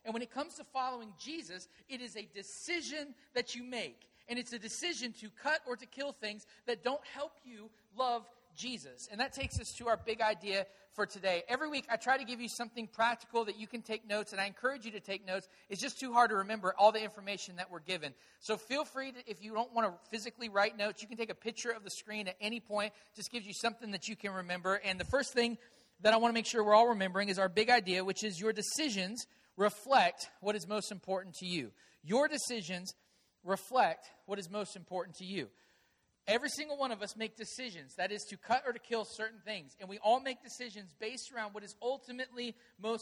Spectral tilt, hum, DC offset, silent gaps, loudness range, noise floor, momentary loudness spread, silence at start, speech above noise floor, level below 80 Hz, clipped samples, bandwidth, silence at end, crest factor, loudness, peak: -3 dB/octave; none; under 0.1%; none; 8 LU; -75 dBFS; 15 LU; 0.05 s; 38 dB; -66 dBFS; under 0.1%; 15 kHz; 0 s; 24 dB; -36 LUFS; -14 dBFS